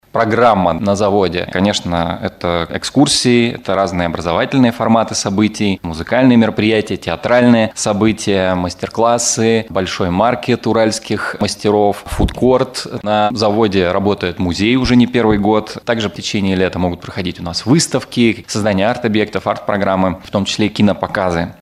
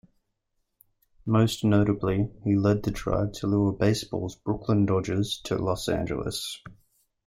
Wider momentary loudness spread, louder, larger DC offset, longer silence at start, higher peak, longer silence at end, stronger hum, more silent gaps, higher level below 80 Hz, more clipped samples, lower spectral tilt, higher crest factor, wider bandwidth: about the same, 7 LU vs 9 LU; first, -15 LUFS vs -26 LUFS; neither; second, 0.15 s vs 1.25 s; first, 0 dBFS vs -8 dBFS; second, 0.1 s vs 0.55 s; neither; neither; first, -36 dBFS vs -48 dBFS; neither; second, -5 dB/octave vs -6.5 dB/octave; about the same, 14 dB vs 18 dB; second, 14 kHz vs 15.5 kHz